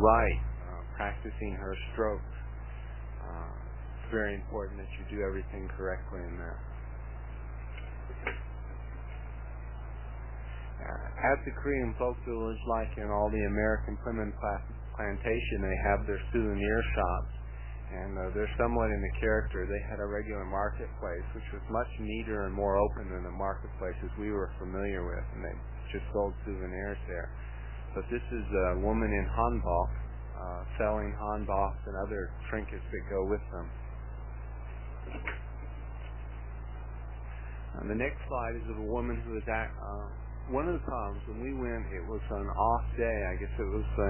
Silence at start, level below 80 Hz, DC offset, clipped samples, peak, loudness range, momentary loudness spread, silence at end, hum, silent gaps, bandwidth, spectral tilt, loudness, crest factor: 0 s; -38 dBFS; 0.2%; under 0.1%; -10 dBFS; 8 LU; 13 LU; 0 s; none; none; 3.2 kHz; -6.5 dB/octave; -35 LUFS; 24 dB